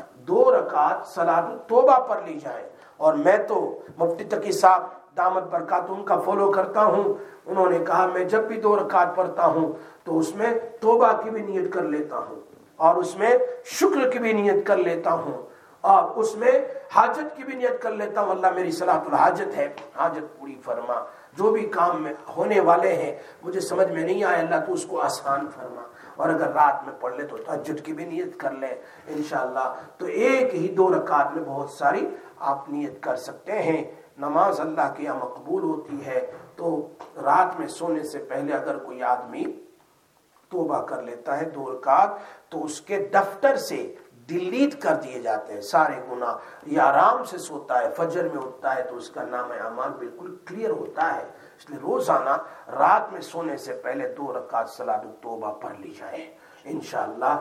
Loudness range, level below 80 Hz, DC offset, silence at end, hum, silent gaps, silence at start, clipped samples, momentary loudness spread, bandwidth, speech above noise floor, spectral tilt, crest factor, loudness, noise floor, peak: 7 LU; -80 dBFS; under 0.1%; 0 s; none; none; 0 s; under 0.1%; 14 LU; 15.5 kHz; 38 dB; -5 dB/octave; 22 dB; -24 LUFS; -61 dBFS; 0 dBFS